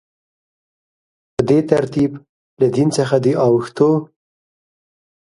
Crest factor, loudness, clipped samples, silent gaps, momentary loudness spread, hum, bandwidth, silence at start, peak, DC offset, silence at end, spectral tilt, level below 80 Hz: 18 dB; -16 LUFS; under 0.1%; 2.29-2.57 s; 6 LU; none; 11.5 kHz; 1.4 s; 0 dBFS; under 0.1%; 1.35 s; -7 dB/octave; -54 dBFS